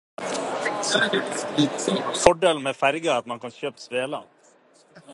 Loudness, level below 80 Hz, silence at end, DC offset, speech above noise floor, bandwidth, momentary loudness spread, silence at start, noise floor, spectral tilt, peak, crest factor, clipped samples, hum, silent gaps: -24 LUFS; -54 dBFS; 0 s; under 0.1%; 33 dB; 11.5 kHz; 12 LU; 0.2 s; -57 dBFS; -3 dB/octave; 0 dBFS; 24 dB; under 0.1%; none; none